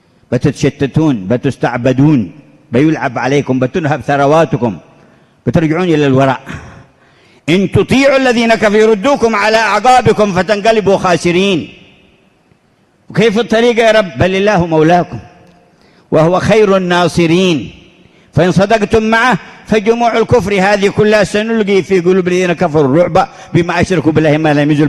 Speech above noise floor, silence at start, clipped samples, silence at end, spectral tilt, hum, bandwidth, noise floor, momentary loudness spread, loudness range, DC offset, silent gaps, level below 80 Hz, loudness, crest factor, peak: 42 dB; 0.3 s; under 0.1%; 0 s; -6 dB/octave; none; 12.5 kHz; -52 dBFS; 6 LU; 4 LU; under 0.1%; none; -40 dBFS; -11 LUFS; 12 dB; 0 dBFS